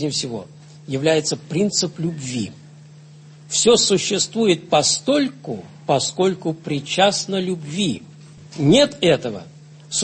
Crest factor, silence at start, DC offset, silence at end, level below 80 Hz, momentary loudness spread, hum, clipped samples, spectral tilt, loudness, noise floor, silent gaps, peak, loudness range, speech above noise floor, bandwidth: 18 dB; 0 s; under 0.1%; 0 s; -58 dBFS; 15 LU; none; under 0.1%; -3.5 dB/octave; -19 LUFS; -43 dBFS; none; -4 dBFS; 4 LU; 24 dB; 8.8 kHz